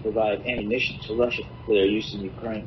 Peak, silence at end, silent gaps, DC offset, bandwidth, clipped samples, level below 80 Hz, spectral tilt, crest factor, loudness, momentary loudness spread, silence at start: -10 dBFS; 0 s; none; under 0.1%; 6.2 kHz; under 0.1%; -46 dBFS; -3.5 dB/octave; 16 dB; -25 LUFS; 10 LU; 0 s